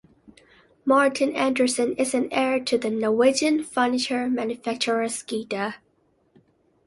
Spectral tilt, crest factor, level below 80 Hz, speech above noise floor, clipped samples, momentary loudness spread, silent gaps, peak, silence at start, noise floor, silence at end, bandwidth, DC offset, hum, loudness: -3 dB/octave; 18 dB; -66 dBFS; 43 dB; under 0.1%; 10 LU; none; -6 dBFS; 0.85 s; -65 dBFS; 1.1 s; 11.5 kHz; under 0.1%; none; -23 LUFS